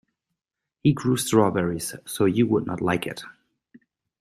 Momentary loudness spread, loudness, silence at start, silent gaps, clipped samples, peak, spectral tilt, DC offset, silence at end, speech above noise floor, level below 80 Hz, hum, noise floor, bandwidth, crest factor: 12 LU; -23 LUFS; 0.85 s; none; under 0.1%; -4 dBFS; -5.5 dB/octave; under 0.1%; 0.9 s; 62 dB; -58 dBFS; none; -85 dBFS; 15.5 kHz; 20 dB